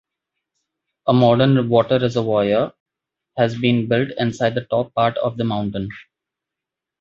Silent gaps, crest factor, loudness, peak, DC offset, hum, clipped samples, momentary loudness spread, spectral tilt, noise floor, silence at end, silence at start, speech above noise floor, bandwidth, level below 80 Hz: 2.80-2.86 s; 18 dB; -19 LUFS; -2 dBFS; under 0.1%; none; under 0.1%; 11 LU; -7.5 dB/octave; -85 dBFS; 1 s; 1.05 s; 67 dB; 7.6 kHz; -54 dBFS